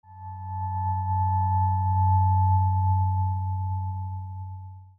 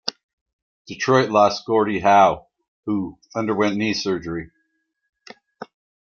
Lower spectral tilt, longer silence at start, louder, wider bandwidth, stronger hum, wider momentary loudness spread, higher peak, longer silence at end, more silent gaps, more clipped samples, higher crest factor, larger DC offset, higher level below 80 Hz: first, -11.5 dB/octave vs -5 dB/octave; about the same, 0.1 s vs 0.05 s; second, -25 LUFS vs -20 LUFS; second, 1.9 kHz vs 7.2 kHz; neither; second, 16 LU vs 23 LU; second, -12 dBFS vs -2 dBFS; second, 0.1 s vs 0.45 s; second, none vs 0.23-0.46 s, 0.53-0.85 s, 2.68-2.83 s, 5.09-5.13 s; neither; second, 12 dB vs 20 dB; neither; first, -50 dBFS vs -58 dBFS